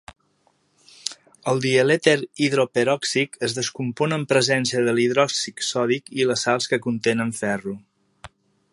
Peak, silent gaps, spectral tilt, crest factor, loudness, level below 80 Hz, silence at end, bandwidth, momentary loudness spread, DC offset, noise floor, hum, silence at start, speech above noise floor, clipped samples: -2 dBFS; none; -4 dB/octave; 20 dB; -22 LUFS; -64 dBFS; 0.45 s; 11.5 kHz; 10 LU; under 0.1%; -65 dBFS; none; 1.05 s; 43 dB; under 0.1%